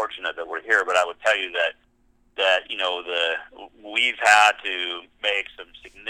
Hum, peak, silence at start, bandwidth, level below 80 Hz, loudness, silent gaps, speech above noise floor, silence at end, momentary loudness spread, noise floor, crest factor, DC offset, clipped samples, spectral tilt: none; -2 dBFS; 0 s; 16 kHz; -64 dBFS; -21 LUFS; none; 39 dB; 0 s; 15 LU; -62 dBFS; 20 dB; under 0.1%; under 0.1%; 0.5 dB/octave